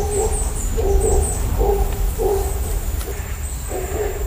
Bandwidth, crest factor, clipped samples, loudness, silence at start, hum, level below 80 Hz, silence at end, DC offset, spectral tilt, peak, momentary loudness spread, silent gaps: 15.5 kHz; 14 dB; under 0.1%; -22 LUFS; 0 s; none; -22 dBFS; 0 s; under 0.1%; -5 dB/octave; -4 dBFS; 8 LU; none